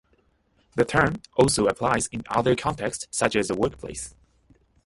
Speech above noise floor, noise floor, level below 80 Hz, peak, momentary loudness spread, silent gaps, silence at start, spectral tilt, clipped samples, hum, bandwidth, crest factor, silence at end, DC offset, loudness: 42 dB; -66 dBFS; -48 dBFS; -4 dBFS; 14 LU; none; 0.75 s; -4.5 dB/octave; under 0.1%; none; 11.5 kHz; 22 dB; 0.75 s; under 0.1%; -24 LUFS